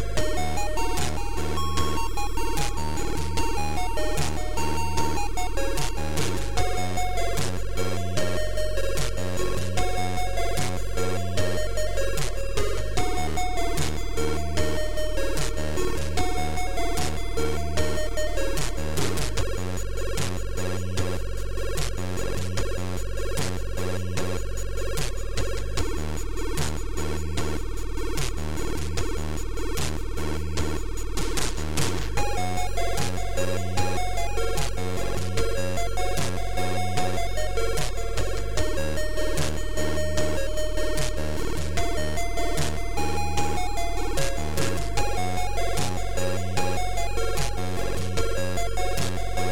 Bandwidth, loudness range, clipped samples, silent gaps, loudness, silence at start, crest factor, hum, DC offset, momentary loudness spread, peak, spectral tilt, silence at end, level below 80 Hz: 18.5 kHz; 2 LU; under 0.1%; none; -29 LUFS; 0 s; 16 dB; none; 7%; 3 LU; -8 dBFS; -4.5 dB/octave; 0 s; -32 dBFS